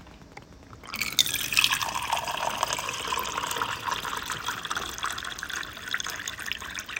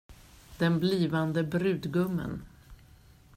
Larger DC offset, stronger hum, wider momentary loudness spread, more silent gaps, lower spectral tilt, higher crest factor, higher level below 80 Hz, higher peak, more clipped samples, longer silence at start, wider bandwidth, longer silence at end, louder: neither; neither; first, 11 LU vs 8 LU; neither; second, -0.5 dB/octave vs -7.5 dB/octave; first, 30 dB vs 16 dB; about the same, -54 dBFS vs -56 dBFS; first, -2 dBFS vs -14 dBFS; neither; about the same, 0 s vs 0.1 s; about the same, 17 kHz vs 15.5 kHz; second, 0 s vs 0.6 s; about the same, -28 LUFS vs -29 LUFS